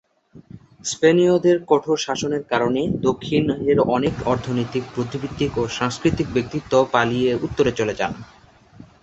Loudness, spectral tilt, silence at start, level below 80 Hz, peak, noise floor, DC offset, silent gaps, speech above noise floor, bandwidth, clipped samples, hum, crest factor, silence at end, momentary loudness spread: -21 LUFS; -5.5 dB/octave; 0.35 s; -46 dBFS; -2 dBFS; -46 dBFS; under 0.1%; none; 27 dB; 8.2 kHz; under 0.1%; none; 18 dB; 0.8 s; 9 LU